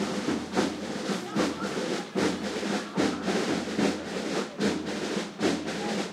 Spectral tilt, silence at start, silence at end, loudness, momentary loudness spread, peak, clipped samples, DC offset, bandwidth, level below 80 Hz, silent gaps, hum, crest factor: -4.5 dB/octave; 0 s; 0 s; -30 LUFS; 4 LU; -10 dBFS; under 0.1%; under 0.1%; 15 kHz; -62 dBFS; none; none; 18 dB